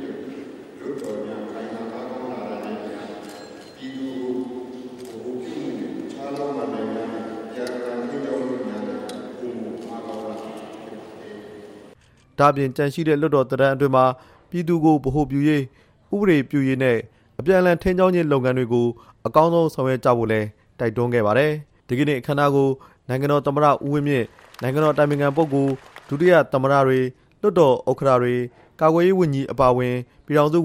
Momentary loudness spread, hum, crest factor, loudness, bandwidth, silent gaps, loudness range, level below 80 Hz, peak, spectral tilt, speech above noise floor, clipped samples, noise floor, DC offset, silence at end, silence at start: 17 LU; none; 18 dB; -21 LUFS; 15.5 kHz; none; 13 LU; -50 dBFS; -2 dBFS; -7.5 dB/octave; 33 dB; under 0.1%; -52 dBFS; under 0.1%; 0 s; 0 s